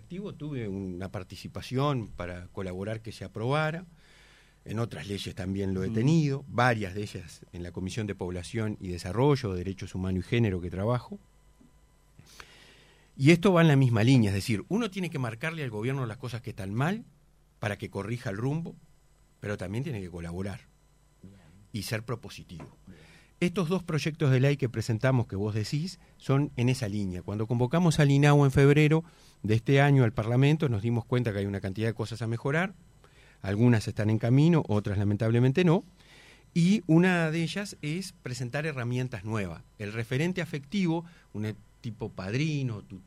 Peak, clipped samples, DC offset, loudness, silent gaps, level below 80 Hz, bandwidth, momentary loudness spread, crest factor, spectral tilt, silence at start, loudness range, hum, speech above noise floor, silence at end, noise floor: -6 dBFS; under 0.1%; under 0.1%; -28 LUFS; none; -56 dBFS; 14 kHz; 16 LU; 22 dB; -7 dB/octave; 0.1 s; 10 LU; none; 35 dB; 0.05 s; -62 dBFS